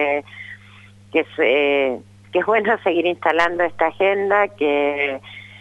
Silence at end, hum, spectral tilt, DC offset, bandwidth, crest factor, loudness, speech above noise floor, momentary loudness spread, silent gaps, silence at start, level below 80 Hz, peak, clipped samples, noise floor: 0.05 s; none; -5.5 dB/octave; under 0.1%; 9 kHz; 18 dB; -19 LUFS; 26 dB; 15 LU; none; 0 s; -60 dBFS; -2 dBFS; under 0.1%; -45 dBFS